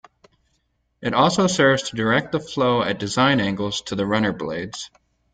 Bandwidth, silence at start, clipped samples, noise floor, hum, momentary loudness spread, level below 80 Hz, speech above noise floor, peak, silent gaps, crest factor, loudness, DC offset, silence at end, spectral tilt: 9.6 kHz; 1 s; under 0.1%; -69 dBFS; none; 12 LU; -54 dBFS; 49 dB; -4 dBFS; none; 18 dB; -21 LUFS; under 0.1%; 0.45 s; -4.5 dB/octave